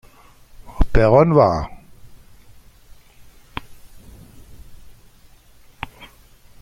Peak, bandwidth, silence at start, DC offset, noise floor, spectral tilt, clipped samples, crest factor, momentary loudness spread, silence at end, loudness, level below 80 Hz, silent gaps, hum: -2 dBFS; 15 kHz; 0.65 s; under 0.1%; -48 dBFS; -8 dB/octave; under 0.1%; 20 dB; 23 LU; 0.55 s; -16 LUFS; -30 dBFS; none; none